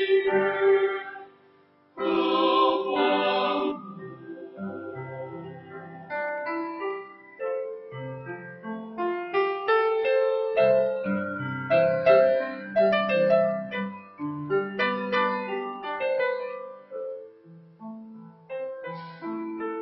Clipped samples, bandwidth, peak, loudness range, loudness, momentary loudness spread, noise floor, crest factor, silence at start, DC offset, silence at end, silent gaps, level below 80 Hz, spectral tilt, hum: under 0.1%; 5.8 kHz; -8 dBFS; 11 LU; -26 LUFS; 19 LU; -59 dBFS; 18 dB; 0 s; under 0.1%; 0 s; none; -70 dBFS; -8.5 dB/octave; none